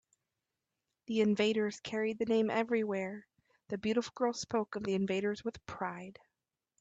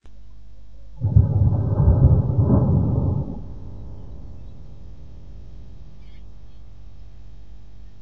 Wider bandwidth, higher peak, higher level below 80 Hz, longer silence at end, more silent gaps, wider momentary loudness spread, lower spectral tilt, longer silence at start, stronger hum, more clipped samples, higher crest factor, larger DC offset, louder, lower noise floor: first, 8 kHz vs 1.7 kHz; second, -18 dBFS vs -2 dBFS; second, -72 dBFS vs -30 dBFS; first, 0.7 s vs 0.15 s; neither; second, 12 LU vs 27 LU; second, -5.5 dB/octave vs -12.5 dB/octave; first, 1.1 s vs 0 s; second, none vs 50 Hz at -45 dBFS; neither; about the same, 16 dB vs 20 dB; second, under 0.1% vs 2%; second, -34 LUFS vs -19 LUFS; first, -89 dBFS vs -45 dBFS